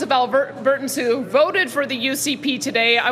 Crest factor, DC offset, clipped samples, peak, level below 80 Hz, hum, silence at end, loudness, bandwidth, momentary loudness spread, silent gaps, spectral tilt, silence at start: 16 dB; under 0.1%; under 0.1%; -2 dBFS; -66 dBFS; none; 0 s; -19 LUFS; 16 kHz; 5 LU; none; -2.5 dB/octave; 0 s